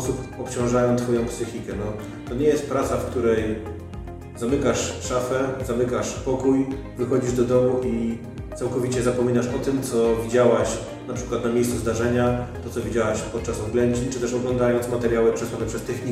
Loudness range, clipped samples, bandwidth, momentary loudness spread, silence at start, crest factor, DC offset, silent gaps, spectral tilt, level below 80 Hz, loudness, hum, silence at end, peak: 2 LU; under 0.1%; 15 kHz; 10 LU; 0 s; 16 dB; under 0.1%; none; -6 dB/octave; -40 dBFS; -23 LUFS; none; 0 s; -6 dBFS